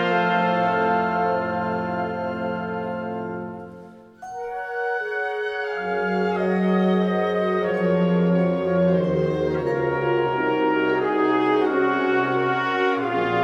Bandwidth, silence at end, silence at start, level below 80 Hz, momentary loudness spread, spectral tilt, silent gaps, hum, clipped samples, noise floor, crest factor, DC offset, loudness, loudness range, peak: 7 kHz; 0 s; 0 s; -56 dBFS; 9 LU; -8 dB/octave; none; none; under 0.1%; -43 dBFS; 14 dB; under 0.1%; -22 LUFS; 8 LU; -8 dBFS